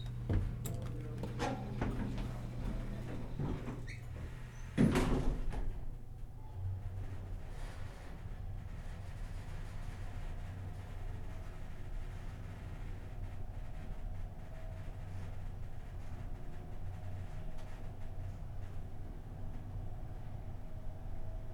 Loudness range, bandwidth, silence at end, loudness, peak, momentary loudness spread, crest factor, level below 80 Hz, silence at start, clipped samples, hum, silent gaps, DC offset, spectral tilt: 10 LU; 16.5 kHz; 0 s; -44 LUFS; -18 dBFS; 11 LU; 22 dB; -44 dBFS; 0 s; under 0.1%; none; none; under 0.1%; -7 dB/octave